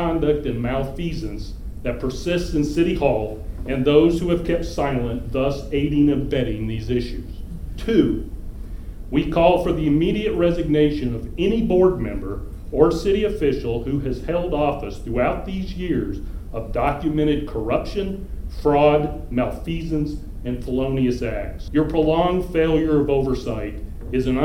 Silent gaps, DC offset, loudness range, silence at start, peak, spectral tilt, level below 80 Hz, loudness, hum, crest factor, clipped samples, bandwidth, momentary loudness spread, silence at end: none; under 0.1%; 4 LU; 0 s; -2 dBFS; -7.5 dB/octave; -32 dBFS; -21 LUFS; none; 20 dB; under 0.1%; 16 kHz; 14 LU; 0 s